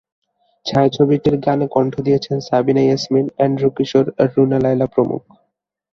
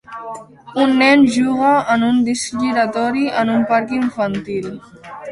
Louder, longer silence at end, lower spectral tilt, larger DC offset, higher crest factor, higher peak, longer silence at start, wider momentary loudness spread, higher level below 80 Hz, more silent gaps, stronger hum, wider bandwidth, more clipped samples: about the same, -16 LUFS vs -16 LUFS; first, 0.75 s vs 0 s; first, -7.5 dB/octave vs -4.5 dB/octave; neither; about the same, 16 dB vs 16 dB; about the same, 0 dBFS vs -2 dBFS; first, 0.65 s vs 0.1 s; second, 4 LU vs 19 LU; about the same, -52 dBFS vs -56 dBFS; neither; neither; second, 7.2 kHz vs 11.5 kHz; neither